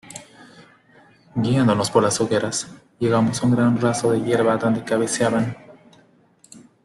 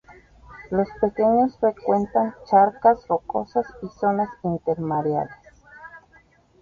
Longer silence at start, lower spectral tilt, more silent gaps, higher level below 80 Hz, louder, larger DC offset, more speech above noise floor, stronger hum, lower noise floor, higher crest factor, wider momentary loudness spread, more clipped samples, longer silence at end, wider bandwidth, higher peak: about the same, 0.1 s vs 0.1 s; second, -5.5 dB/octave vs -9.5 dB/octave; neither; about the same, -58 dBFS vs -54 dBFS; about the same, -20 LUFS vs -22 LUFS; neither; about the same, 36 dB vs 35 dB; neither; about the same, -55 dBFS vs -56 dBFS; about the same, 18 dB vs 18 dB; about the same, 11 LU vs 9 LU; neither; second, 0.25 s vs 0.65 s; first, 12.5 kHz vs 7 kHz; about the same, -2 dBFS vs -4 dBFS